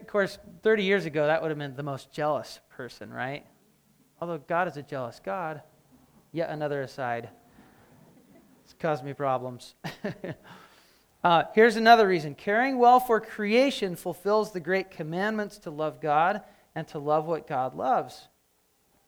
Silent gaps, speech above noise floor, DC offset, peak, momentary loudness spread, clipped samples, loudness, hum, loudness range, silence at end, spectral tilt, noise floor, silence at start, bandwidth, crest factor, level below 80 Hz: none; 42 dB; under 0.1%; -6 dBFS; 19 LU; under 0.1%; -27 LUFS; none; 13 LU; 0.85 s; -5.5 dB/octave; -69 dBFS; 0 s; over 20 kHz; 22 dB; -68 dBFS